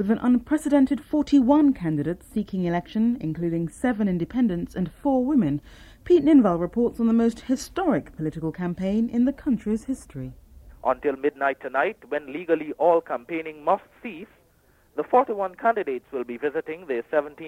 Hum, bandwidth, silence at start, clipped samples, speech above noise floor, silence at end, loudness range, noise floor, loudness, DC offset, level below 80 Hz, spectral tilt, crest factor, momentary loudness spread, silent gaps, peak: none; 13 kHz; 0 s; under 0.1%; 37 dB; 0 s; 5 LU; -60 dBFS; -24 LUFS; under 0.1%; -50 dBFS; -7.5 dB/octave; 16 dB; 11 LU; none; -8 dBFS